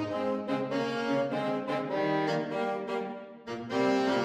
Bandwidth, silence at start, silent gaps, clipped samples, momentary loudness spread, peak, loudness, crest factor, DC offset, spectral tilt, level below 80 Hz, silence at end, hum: 10.5 kHz; 0 s; none; under 0.1%; 8 LU; -16 dBFS; -31 LUFS; 14 dB; under 0.1%; -6 dB/octave; -72 dBFS; 0 s; none